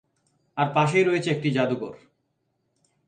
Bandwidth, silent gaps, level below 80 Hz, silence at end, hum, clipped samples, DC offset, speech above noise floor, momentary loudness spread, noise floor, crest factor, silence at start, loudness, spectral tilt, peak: 9.4 kHz; none; -68 dBFS; 1.1 s; none; under 0.1%; under 0.1%; 51 dB; 13 LU; -74 dBFS; 18 dB; 0.55 s; -23 LUFS; -6.5 dB/octave; -8 dBFS